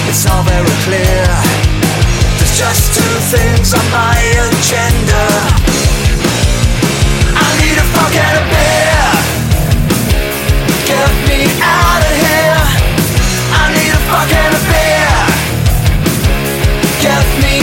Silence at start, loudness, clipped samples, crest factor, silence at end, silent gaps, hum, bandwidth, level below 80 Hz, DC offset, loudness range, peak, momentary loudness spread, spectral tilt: 0 s; -10 LUFS; under 0.1%; 10 dB; 0 s; none; none; 17.5 kHz; -16 dBFS; under 0.1%; 1 LU; 0 dBFS; 3 LU; -4 dB/octave